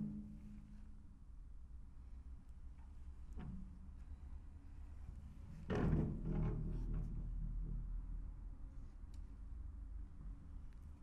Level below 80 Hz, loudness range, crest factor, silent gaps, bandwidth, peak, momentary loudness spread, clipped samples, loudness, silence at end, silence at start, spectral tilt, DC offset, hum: -48 dBFS; 13 LU; 22 dB; none; 6.2 kHz; -24 dBFS; 17 LU; under 0.1%; -49 LUFS; 0 s; 0 s; -9 dB/octave; under 0.1%; none